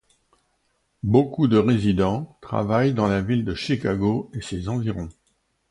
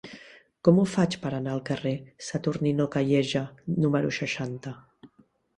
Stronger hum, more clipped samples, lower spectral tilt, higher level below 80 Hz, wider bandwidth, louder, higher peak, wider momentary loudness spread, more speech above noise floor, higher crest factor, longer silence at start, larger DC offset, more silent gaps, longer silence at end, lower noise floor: neither; neither; about the same, -7.5 dB/octave vs -6.5 dB/octave; first, -44 dBFS vs -62 dBFS; about the same, 11.5 kHz vs 11 kHz; first, -23 LUFS vs -27 LUFS; about the same, -4 dBFS vs -6 dBFS; second, 11 LU vs 14 LU; first, 48 dB vs 36 dB; about the same, 20 dB vs 22 dB; first, 1.05 s vs 0.05 s; neither; neither; about the same, 0.6 s vs 0.5 s; first, -70 dBFS vs -62 dBFS